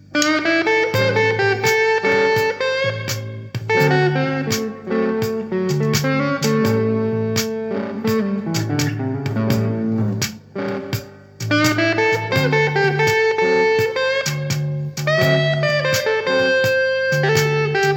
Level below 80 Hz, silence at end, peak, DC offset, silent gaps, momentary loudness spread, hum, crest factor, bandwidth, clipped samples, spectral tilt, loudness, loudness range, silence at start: -56 dBFS; 0 s; 0 dBFS; under 0.1%; none; 8 LU; none; 18 dB; 20 kHz; under 0.1%; -5 dB/octave; -18 LUFS; 4 LU; 0.1 s